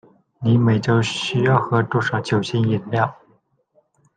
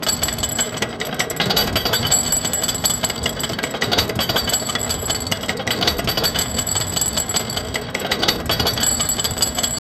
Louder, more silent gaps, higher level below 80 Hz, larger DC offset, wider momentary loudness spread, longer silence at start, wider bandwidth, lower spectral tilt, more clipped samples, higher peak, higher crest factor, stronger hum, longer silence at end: about the same, -20 LUFS vs -19 LUFS; neither; second, -56 dBFS vs -38 dBFS; neither; about the same, 5 LU vs 6 LU; first, 0.4 s vs 0 s; second, 9.2 kHz vs 19.5 kHz; first, -6.5 dB/octave vs -2 dB/octave; neither; about the same, -2 dBFS vs 0 dBFS; about the same, 18 dB vs 20 dB; neither; first, 1.05 s vs 0.2 s